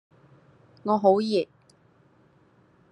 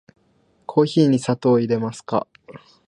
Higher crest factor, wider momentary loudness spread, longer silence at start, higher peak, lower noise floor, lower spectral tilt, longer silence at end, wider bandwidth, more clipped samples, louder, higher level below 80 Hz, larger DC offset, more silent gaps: about the same, 22 dB vs 18 dB; first, 15 LU vs 10 LU; first, 0.85 s vs 0.7 s; about the same, -6 dBFS vs -4 dBFS; about the same, -60 dBFS vs -61 dBFS; about the same, -7 dB/octave vs -7 dB/octave; first, 1.5 s vs 0.3 s; about the same, 10 kHz vs 11 kHz; neither; second, -24 LUFS vs -20 LUFS; second, -76 dBFS vs -64 dBFS; neither; neither